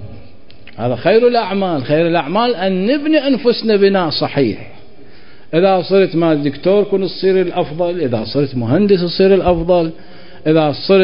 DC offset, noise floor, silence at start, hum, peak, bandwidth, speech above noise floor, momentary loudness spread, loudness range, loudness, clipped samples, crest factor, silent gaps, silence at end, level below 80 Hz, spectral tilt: 3%; -43 dBFS; 0 s; none; 0 dBFS; 5.4 kHz; 30 dB; 6 LU; 1 LU; -14 LUFS; under 0.1%; 14 dB; none; 0 s; -42 dBFS; -11.5 dB/octave